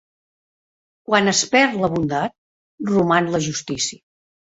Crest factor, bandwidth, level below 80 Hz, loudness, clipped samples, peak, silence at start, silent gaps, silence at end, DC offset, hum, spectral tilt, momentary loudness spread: 20 dB; 8 kHz; -56 dBFS; -19 LUFS; under 0.1%; -2 dBFS; 1.1 s; 2.38-2.78 s; 0.65 s; under 0.1%; none; -3.5 dB/octave; 9 LU